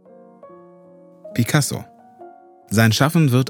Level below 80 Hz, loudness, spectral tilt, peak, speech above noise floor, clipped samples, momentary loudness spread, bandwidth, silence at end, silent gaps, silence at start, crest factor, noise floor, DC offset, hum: -62 dBFS; -18 LUFS; -5 dB/octave; 0 dBFS; 30 dB; under 0.1%; 12 LU; 20 kHz; 0 s; none; 0.45 s; 20 dB; -47 dBFS; under 0.1%; none